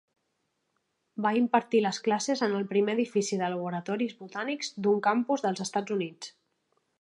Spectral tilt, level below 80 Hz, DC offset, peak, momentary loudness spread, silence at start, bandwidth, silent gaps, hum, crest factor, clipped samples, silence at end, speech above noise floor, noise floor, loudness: -4.5 dB/octave; -82 dBFS; under 0.1%; -10 dBFS; 9 LU; 1.15 s; 11 kHz; none; none; 20 dB; under 0.1%; 0.7 s; 50 dB; -78 dBFS; -29 LUFS